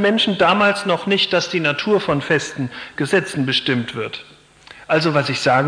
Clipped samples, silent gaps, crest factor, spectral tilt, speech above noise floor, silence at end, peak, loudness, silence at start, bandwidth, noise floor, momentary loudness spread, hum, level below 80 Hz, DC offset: under 0.1%; none; 16 dB; -4.5 dB/octave; 26 dB; 0 s; -4 dBFS; -18 LUFS; 0 s; 10.5 kHz; -44 dBFS; 11 LU; none; -56 dBFS; under 0.1%